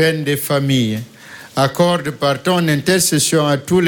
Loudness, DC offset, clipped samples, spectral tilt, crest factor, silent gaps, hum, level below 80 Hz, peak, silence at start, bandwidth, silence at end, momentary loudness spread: -16 LUFS; under 0.1%; under 0.1%; -4.5 dB/octave; 14 dB; none; none; -50 dBFS; -2 dBFS; 0 s; 17.5 kHz; 0 s; 10 LU